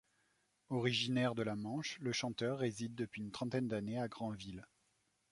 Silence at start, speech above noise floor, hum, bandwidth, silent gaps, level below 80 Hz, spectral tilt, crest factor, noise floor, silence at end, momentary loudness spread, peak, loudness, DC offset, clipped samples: 0.7 s; 40 dB; none; 11.5 kHz; none; -72 dBFS; -5 dB/octave; 20 dB; -79 dBFS; 0.65 s; 9 LU; -22 dBFS; -40 LUFS; under 0.1%; under 0.1%